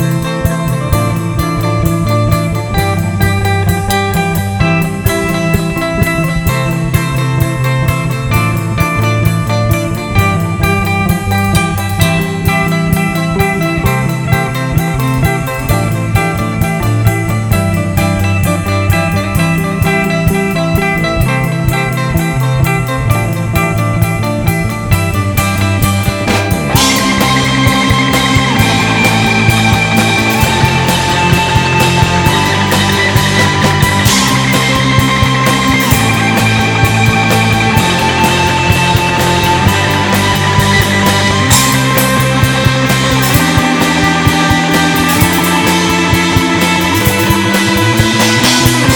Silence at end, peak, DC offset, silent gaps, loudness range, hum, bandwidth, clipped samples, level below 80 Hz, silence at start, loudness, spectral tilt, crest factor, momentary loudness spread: 0 s; 0 dBFS; under 0.1%; none; 4 LU; none; over 20 kHz; 0.4%; -26 dBFS; 0 s; -11 LUFS; -4.5 dB/octave; 10 dB; 4 LU